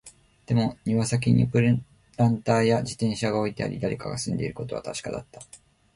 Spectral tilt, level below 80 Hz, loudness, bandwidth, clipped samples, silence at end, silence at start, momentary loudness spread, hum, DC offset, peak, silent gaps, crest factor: -6.5 dB/octave; -52 dBFS; -25 LUFS; 11.5 kHz; under 0.1%; 0.4 s; 0.05 s; 12 LU; none; under 0.1%; -8 dBFS; none; 18 dB